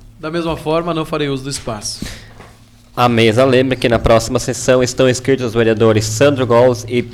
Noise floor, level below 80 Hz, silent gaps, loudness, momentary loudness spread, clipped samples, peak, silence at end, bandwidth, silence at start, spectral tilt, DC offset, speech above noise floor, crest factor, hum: -43 dBFS; -36 dBFS; none; -14 LUFS; 11 LU; under 0.1%; -2 dBFS; 0 s; 16 kHz; 0.2 s; -5 dB/octave; under 0.1%; 29 dB; 12 dB; none